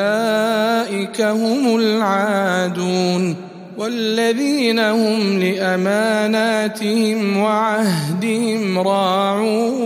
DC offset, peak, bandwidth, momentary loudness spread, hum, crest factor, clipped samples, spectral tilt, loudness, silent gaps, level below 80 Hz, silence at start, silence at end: under 0.1%; -4 dBFS; 15.5 kHz; 4 LU; none; 14 dB; under 0.1%; -5 dB/octave; -17 LUFS; none; -70 dBFS; 0 s; 0 s